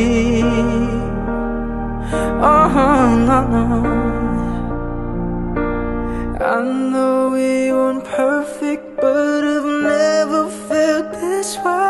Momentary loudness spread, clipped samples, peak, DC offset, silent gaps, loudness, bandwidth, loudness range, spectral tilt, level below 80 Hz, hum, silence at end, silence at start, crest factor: 10 LU; under 0.1%; -2 dBFS; under 0.1%; none; -17 LUFS; 12.5 kHz; 4 LU; -6 dB/octave; -28 dBFS; none; 0 s; 0 s; 16 dB